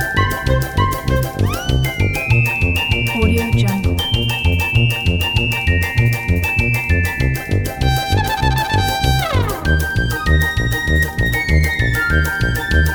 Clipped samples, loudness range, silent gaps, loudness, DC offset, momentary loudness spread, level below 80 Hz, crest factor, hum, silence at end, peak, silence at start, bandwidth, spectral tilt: under 0.1%; 1 LU; none; -16 LUFS; under 0.1%; 3 LU; -22 dBFS; 14 dB; none; 0 s; -2 dBFS; 0 s; over 20 kHz; -5 dB/octave